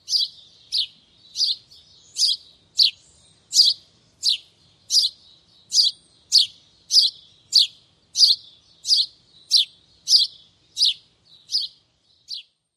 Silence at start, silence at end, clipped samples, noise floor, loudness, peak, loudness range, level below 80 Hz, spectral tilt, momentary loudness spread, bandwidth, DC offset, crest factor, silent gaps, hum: 0.1 s; 0.35 s; under 0.1%; -62 dBFS; -19 LUFS; -4 dBFS; 3 LU; -72 dBFS; 4 dB/octave; 17 LU; 16 kHz; under 0.1%; 20 dB; none; none